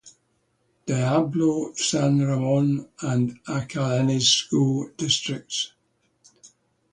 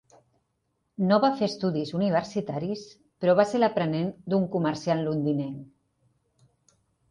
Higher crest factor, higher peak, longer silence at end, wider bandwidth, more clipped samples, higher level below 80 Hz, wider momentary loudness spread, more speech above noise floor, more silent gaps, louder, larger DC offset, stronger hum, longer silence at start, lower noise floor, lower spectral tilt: about the same, 18 dB vs 20 dB; about the same, -6 dBFS vs -8 dBFS; second, 0.45 s vs 1.45 s; about the same, 10.5 kHz vs 10.5 kHz; neither; first, -60 dBFS vs -66 dBFS; about the same, 9 LU vs 10 LU; second, 46 dB vs 51 dB; neither; first, -23 LUFS vs -26 LUFS; neither; neither; second, 0.05 s vs 1 s; second, -69 dBFS vs -76 dBFS; second, -4.5 dB/octave vs -7 dB/octave